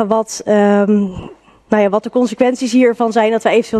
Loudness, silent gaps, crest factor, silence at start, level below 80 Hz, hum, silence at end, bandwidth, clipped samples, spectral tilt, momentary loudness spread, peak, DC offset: -14 LUFS; none; 14 dB; 0 s; -50 dBFS; none; 0 s; 12.5 kHz; under 0.1%; -5.5 dB/octave; 5 LU; 0 dBFS; under 0.1%